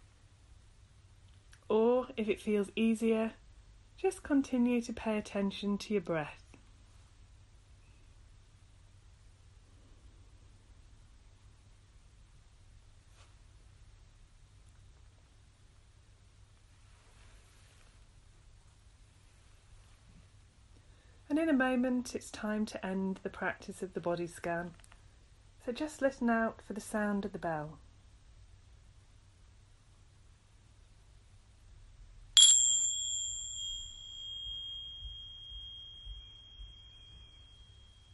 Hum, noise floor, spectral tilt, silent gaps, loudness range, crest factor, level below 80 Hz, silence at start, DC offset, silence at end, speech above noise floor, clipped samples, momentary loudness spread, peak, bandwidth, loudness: none; -61 dBFS; -2.5 dB/octave; none; 16 LU; 30 dB; -60 dBFS; 0.5 s; under 0.1%; 0.5 s; 27 dB; under 0.1%; 19 LU; -8 dBFS; 11.5 kHz; -32 LUFS